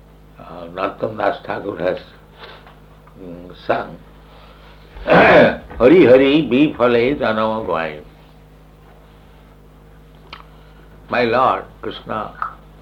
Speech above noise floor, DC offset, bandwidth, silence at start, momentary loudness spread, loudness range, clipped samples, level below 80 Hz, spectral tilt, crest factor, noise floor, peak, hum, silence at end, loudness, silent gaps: 29 dB; under 0.1%; 7 kHz; 0.4 s; 22 LU; 15 LU; under 0.1%; -44 dBFS; -7.5 dB/octave; 18 dB; -44 dBFS; -2 dBFS; none; 0.3 s; -15 LUFS; none